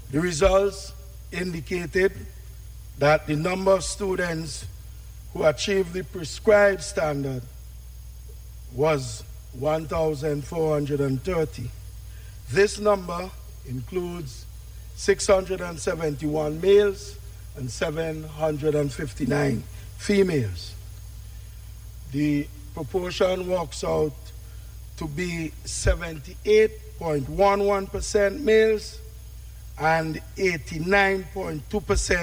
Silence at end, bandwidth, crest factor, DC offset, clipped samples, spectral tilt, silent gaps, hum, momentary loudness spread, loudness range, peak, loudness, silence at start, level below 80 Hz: 0 s; 17 kHz; 20 dB; under 0.1%; under 0.1%; -5 dB/octave; none; 50 Hz at -45 dBFS; 22 LU; 5 LU; -6 dBFS; -24 LUFS; 0 s; -40 dBFS